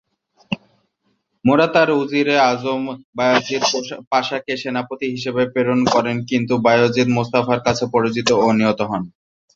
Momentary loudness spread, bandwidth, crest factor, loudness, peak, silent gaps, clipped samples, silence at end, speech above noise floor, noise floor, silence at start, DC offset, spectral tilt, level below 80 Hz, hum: 10 LU; 7.8 kHz; 18 dB; -18 LUFS; -2 dBFS; 3.04-3.13 s, 4.07-4.11 s; under 0.1%; 0.45 s; 50 dB; -68 dBFS; 0.5 s; under 0.1%; -5 dB/octave; -56 dBFS; none